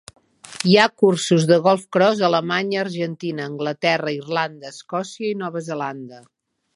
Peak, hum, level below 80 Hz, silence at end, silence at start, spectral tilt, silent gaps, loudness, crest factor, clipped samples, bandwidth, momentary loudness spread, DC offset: 0 dBFS; none; -68 dBFS; 0.55 s; 0.45 s; -5 dB/octave; none; -20 LUFS; 20 dB; under 0.1%; 11.5 kHz; 13 LU; under 0.1%